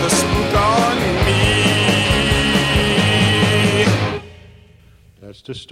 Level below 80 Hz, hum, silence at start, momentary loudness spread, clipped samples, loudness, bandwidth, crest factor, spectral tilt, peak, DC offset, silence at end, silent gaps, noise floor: -30 dBFS; none; 0 s; 5 LU; under 0.1%; -15 LUFS; 15.5 kHz; 14 dB; -4.5 dB/octave; -2 dBFS; under 0.1%; 0.05 s; none; -47 dBFS